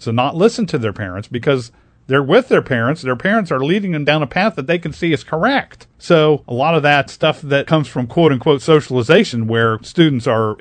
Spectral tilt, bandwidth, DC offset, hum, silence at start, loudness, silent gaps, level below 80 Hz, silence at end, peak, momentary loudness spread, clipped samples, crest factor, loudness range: -6.5 dB/octave; 9.4 kHz; under 0.1%; none; 0 s; -15 LUFS; none; -50 dBFS; 0.05 s; 0 dBFS; 7 LU; under 0.1%; 16 dB; 2 LU